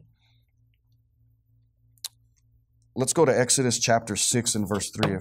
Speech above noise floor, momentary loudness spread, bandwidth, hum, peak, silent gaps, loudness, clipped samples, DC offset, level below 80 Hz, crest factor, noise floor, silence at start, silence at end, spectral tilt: 41 dB; 18 LU; 16 kHz; none; -6 dBFS; none; -23 LUFS; under 0.1%; under 0.1%; -62 dBFS; 22 dB; -65 dBFS; 2.05 s; 0 s; -3.5 dB/octave